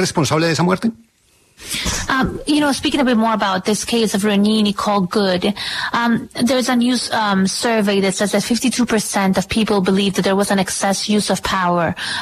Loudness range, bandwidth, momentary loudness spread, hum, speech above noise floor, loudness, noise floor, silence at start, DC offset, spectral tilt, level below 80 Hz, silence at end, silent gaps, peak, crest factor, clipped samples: 2 LU; 13.5 kHz; 3 LU; none; 38 dB; -17 LUFS; -55 dBFS; 0 s; under 0.1%; -4 dB/octave; -42 dBFS; 0 s; none; -2 dBFS; 14 dB; under 0.1%